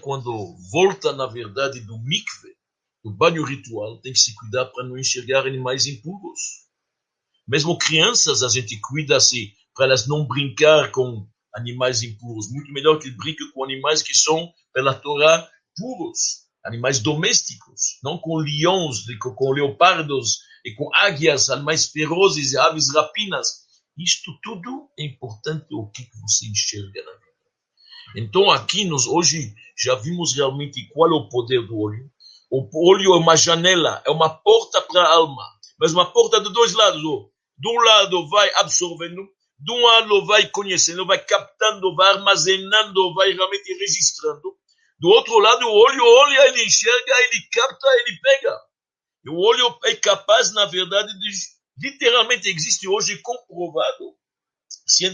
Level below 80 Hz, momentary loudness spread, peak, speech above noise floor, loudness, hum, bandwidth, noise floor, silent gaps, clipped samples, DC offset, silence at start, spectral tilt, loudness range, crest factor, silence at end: -66 dBFS; 17 LU; 0 dBFS; over 71 dB; -17 LUFS; none; 10.5 kHz; under -90 dBFS; none; under 0.1%; under 0.1%; 0.05 s; -2 dB/octave; 8 LU; 20 dB; 0 s